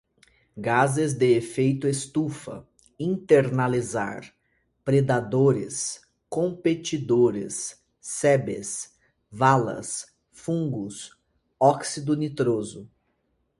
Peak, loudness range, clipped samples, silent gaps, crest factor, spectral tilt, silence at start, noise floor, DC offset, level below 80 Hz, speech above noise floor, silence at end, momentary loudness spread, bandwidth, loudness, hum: -4 dBFS; 3 LU; under 0.1%; none; 22 dB; -5.5 dB/octave; 0.55 s; -72 dBFS; under 0.1%; -62 dBFS; 48 dB; 0.75 s; 17 LU; 11.5 kHz; -25 LUFS; none